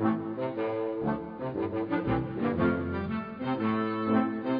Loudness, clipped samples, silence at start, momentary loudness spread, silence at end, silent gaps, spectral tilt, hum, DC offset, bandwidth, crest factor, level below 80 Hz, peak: -30 LUFS; under 0.1%; 0 s; 6 LU; 0 s; none; -10.5 dB/octave; none; under 0.1%; 5.2 kHz; 14 dB; -54 dBFS; -14 dBFS